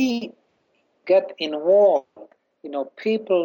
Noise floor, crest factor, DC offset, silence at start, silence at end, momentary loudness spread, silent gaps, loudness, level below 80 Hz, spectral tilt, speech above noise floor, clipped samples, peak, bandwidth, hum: -67 dBFS; 14 dB; under 0.1%; 0 s; 0 s; 20 LU; none; -21 LUFS; -74 dBFS; -5.5 dB/octave; 46 dB; under 0.1%; -8 dBFS; 16.5 kHz; none